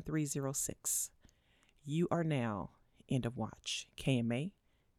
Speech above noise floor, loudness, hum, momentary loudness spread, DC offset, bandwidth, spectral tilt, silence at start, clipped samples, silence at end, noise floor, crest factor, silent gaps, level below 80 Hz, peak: 34 dB; -37 LUFS; none; 9 LU; under 0.1%; 17.5 kHz; -4.5 dB/octave; 0 s; under 0.1%; 0.5 s; -71 dBFS; 18 dB; none; -64 dBFS; -20 dBFS